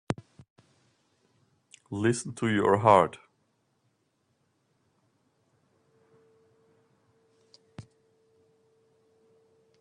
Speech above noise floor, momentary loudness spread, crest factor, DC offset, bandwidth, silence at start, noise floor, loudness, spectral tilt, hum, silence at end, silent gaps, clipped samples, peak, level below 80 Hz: 50 dB; 30 LU; 28 dB; under 0.1%; 10.5 kHz; 0.1 s; -74 dBFS; -26 LUFS; -6 dB/octave; none; 2 s; 0.50-0.56 s; under 0.1%; -4 dBFS; -70 dBFS